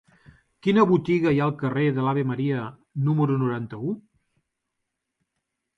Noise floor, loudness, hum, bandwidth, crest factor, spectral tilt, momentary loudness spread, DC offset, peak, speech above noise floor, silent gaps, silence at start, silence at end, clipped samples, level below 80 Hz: -81 dBFS; -24 LUFS; none; 7.2 kHz; 18 dB; -9 dB/octave; 11 LU; under 0.1%; -6 dBFS; 59 dB; none; 0.65 s; 1.8 s; under 0.1%; -60 dBFS